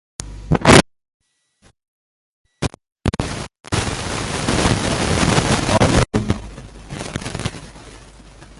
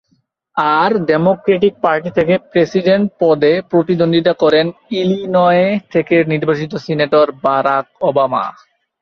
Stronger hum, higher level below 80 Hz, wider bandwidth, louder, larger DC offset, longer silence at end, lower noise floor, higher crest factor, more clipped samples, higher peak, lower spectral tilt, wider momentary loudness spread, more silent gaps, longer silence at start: neither; first, -32 dBFS vs -54 dBFS; first, 12 kHz vs 6.6 kHz; second, -18 LUFS vs -14 LUFS; neither; second, 0.15 s vs 0.5 s; second, -57 dBFS vs -62 dBFS; first, 20 dB vs 14 dB; neither; about the same, 0 dBFS vs 0 dBFS; second, -4.5 dB/octave vs -7.5 dB/octave; first, 20 LU vs 6 LU; first, 1.14-1.20 s, 1.88-2.45 s vs none; second, 0.2 s vs 0.55 s